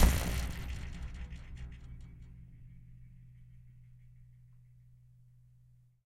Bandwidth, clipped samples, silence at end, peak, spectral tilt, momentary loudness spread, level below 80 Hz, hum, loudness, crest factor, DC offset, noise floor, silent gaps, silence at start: 16.5 kHz; under 0.1%; 1.5 s; -10 dBFS; -5 dB/octave; 24 LU; -40 dBFS; none; -40 LUFS; 26 dB; under 0.1%; -63 dBFS; none; 0 s